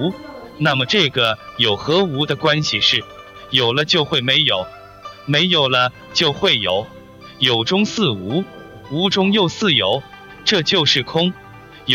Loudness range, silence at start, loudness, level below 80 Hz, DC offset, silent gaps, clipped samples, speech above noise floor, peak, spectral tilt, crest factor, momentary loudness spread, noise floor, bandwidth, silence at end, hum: 2 LU; 0 s; -16 LUFS; -52 dBFS; under 0.1%; none; under 0.1%; 20 dB; -2 dBFS; -4.5 dB/octave; 18 dB; 13 LU; -38 dBFS; 16 kHz; 0 s; none